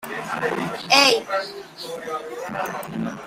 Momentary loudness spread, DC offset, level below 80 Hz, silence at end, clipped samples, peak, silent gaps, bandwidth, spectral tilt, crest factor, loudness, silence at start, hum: 18 LU; under 0.1%; -62 dBFS; 0 s; under 0.1%; -2 dBFS; none; 16 kHz; -2.5 dB/octave; 22 dB; -21 LUFS; 0 s; none